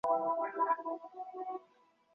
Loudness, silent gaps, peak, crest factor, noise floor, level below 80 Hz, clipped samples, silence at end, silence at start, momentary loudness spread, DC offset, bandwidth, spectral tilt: -36 LUFS; none; -20 dBFS; 16 dB; -69 dBFS; -82 dBFS; under 0.1%; 0.55 s; 0.05 s; 12 LU; under 0.1%; 6.6 kHz; -4 dB/octave